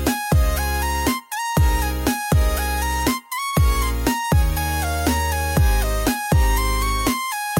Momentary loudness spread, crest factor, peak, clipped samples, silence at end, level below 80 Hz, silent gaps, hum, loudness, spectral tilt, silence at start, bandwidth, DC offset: 3 LU; 14 dB; -6 dBFS; under 0.1%; 0 s; -22 dBFS; none; none; -21 LUFS; -4.5 dB/octave; 0 s; 17 kHz; under 0.1%